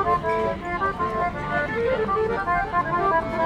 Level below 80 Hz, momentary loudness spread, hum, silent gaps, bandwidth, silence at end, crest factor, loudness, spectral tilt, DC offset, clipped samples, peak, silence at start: -42 dBFS; 4 LU; none; none; 11 kHz; 0 s; 14 dB; -24 LUFS; -7 dB/octave; under 0.1%; under 0.1%; -10 dBFS; 0 s